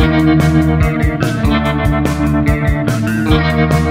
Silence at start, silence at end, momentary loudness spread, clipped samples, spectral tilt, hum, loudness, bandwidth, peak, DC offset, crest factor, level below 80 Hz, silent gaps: 0 s; 0 s; 4 LU; under 0.1%; -7 dB/octave; none; -13 LUFS; 16 kHz; 0 dBFS; under 0.1%; 12 dB; -20 dBFS; none